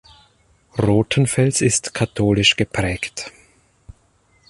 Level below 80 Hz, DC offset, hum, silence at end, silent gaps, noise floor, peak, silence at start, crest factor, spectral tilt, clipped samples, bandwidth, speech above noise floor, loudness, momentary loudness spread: -42 dBFS; under 0.1%; none; 1.2 s; none; -59 dBFS; -2 dBFS; 0.75 s; 20 dB; -4 dB/octave; under 0.1%; 11.5 kHz; 41 dB; -18 LUFS; 13 LU